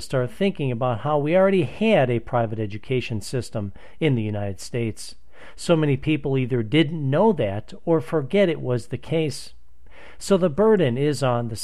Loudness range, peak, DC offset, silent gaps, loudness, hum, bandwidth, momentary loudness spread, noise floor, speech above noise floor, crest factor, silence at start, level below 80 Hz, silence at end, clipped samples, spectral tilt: 4 LU; -6 dBFS; 2%; none; -22 LUFS; none; 13.5 kHz; 11 LU; -49 dBFS; 27 dB; 16 dB; 0 s; -50 dBFS; 0 s; under 0.1%; -6.5 dB/octave